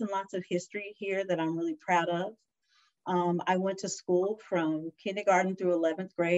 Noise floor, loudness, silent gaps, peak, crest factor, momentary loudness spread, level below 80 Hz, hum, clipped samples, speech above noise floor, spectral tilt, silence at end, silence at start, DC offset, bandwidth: -71 dBFS; -31 LUFS; none; -12 dBFS; 18 dB; 9 LU; -80 dBFS; none; under 0.1%; 40 dB; -5.5 dB/octave; 0 s; 0 s; under 0.1%; 8.2 kHz